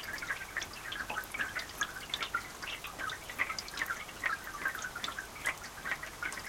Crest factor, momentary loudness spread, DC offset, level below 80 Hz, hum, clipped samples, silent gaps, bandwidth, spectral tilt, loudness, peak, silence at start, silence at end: 22 dB; 4 LU; under 0.1%; -60 dBFS; none; under 0.1%; none; 17 kHz; -1 dB/octave; -37 LUFS; -18 dBFS; 0 s; 0 s